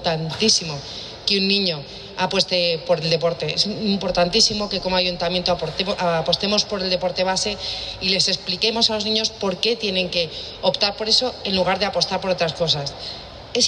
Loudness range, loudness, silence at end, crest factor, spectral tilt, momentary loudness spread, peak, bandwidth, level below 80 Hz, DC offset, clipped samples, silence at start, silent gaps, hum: 1 LU; -20 LUFS; 0 s; 18 dB; -3 dB/octave; 8 LU; -4 dBFS; 10.5 kHz; -46 dBFS; under 0.1%; under 0.1%; 0 s; none; none